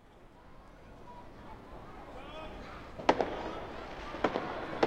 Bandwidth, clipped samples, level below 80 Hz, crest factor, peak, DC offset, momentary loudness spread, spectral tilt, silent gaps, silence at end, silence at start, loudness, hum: 16 kHz; under 0.1%; -54 dBFS; 30 dB; -6 dBFS; under 0.1%; 24 LU; -5.5 dB/octave; none; 0 s; 0 s; -37 LUFS; none